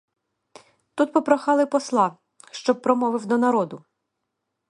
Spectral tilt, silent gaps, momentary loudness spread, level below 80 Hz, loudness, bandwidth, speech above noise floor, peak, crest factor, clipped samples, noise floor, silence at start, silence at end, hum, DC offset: -5 dB/octave; none; 11 LU; -76 dBFS; -22 LUFS; 11.5 kHz; 59 dB; -4 dBFS; 20 dB; under 0.1%; -79 dBFS; 0.95 s; 0.95 s; none; under 0.1%